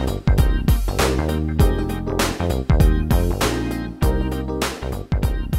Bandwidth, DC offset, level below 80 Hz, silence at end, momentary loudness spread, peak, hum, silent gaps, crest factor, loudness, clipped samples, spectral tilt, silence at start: 16 kHz; under 0.1%; -22 dBFS; 0 s; 7 LU; -2 dBFS; none; none; 16 dB; -21 LUFS; under 0.1%; -6 dB/octave; 0 s